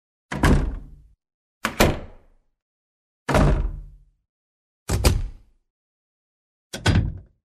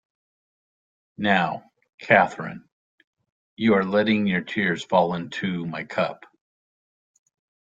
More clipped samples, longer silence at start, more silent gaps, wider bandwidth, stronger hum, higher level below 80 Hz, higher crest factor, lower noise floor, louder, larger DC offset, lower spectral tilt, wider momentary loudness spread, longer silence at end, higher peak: neither; second, 0.3 s vs 1.2 s; first, 1.34-1.61 s, 2.62-3.26 s, 4.29-4.86 s, 5.70-6.70 s vs 1.94-1.98 s, 2.72-2.98 s, 3.07-3.13 s, 3.32-3.57 s; first, 14 kHz vs 7.8 kHz; neither; first, -30 dBFS vs -64 dBFS; about the same, 24 dB vs 22 dB; second, -52 dBFS vs under -90 dBFS; about the same, -23 LUFS vs -23 LUFS; neither; about the same, -5.5 dB/octave vs -6.5 dB/octave; first, 19 LU vs 15 LU; second, 0.3 s vs 1.55 s; about the same, -2 dBFS vs -2 dBFS